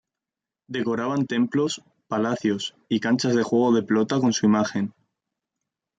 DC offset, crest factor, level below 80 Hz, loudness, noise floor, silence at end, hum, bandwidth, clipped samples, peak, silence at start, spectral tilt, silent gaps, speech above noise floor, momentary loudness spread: under 0.1%; 16 dB; -68 dBFS; -23 LUFS; -89 dBFS; 1.1 s; none; 9 kHz; under 0.1%; -8 dBFS; 0.7 s; -5.5 dB/octave; none; 66 dB; 9 LU